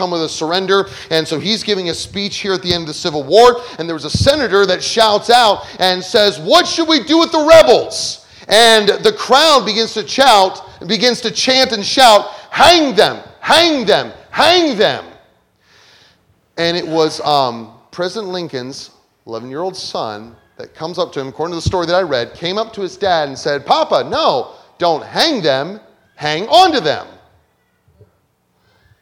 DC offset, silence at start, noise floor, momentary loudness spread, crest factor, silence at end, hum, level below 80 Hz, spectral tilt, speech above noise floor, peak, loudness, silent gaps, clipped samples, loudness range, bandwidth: under 0.1%; 0 s; -60 dBFS; 14 LU; 14 dB; 1.95 s; none; -44 dBFS; -3 dB/octave; 47 dB; 0 dBFS; -13 LUFS; none; 0.4%; 9 LU; 19.5 kHz